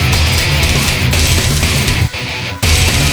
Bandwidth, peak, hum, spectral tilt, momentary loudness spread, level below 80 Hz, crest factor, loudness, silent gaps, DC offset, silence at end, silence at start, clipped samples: over 20 kHz; 0 dBFS; none; -3.5 dB/octave; 5 LU; -18 dBFS; 12 dB; -12 LUFS; none; under 0.1%; 0 s; 0 s; under 0.1%